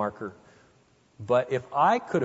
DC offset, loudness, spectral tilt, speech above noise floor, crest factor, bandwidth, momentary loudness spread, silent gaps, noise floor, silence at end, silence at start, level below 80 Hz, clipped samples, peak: under 0.1%; -25 LUFS; -6.5 dB/octave; 36 dB; 18 dB; 8 kHz; 17 LU; none; -62 dBFS; 0 s; 0 s; -68 dBFS; under 0.1%; -10 dBFS